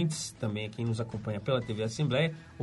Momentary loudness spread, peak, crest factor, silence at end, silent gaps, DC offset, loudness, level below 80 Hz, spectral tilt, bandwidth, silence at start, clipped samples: 6 LU; -16 dBFS; 16 dB; 0 s; none; under 0.1%; -32 LUFS; -60 dBFS; -5.5 dB/octave; 11.5 kHz; 0 s; under 0.1%